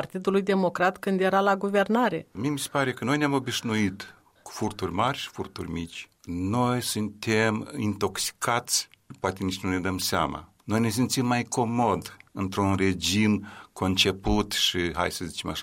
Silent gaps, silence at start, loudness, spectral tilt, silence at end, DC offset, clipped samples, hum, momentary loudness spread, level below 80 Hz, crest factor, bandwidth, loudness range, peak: none; 0 s; -26 LUFS; -4 dB/octave; 0 s; under 0.1%; under 0.1%; none; 11 LU; -50 dBFS; 20 dB; 16 kHz; 4 LU; -8 dBFS